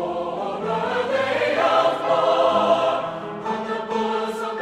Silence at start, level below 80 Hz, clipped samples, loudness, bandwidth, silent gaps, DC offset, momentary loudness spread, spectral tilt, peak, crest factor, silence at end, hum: 0 s; -60 dBFS; under 0.1%; -22 LUFS; 12.5 kHz; none; under 0.1%; 9 LU; -5 dB/octave; -6 dBFS; 16 dB; 0 s; none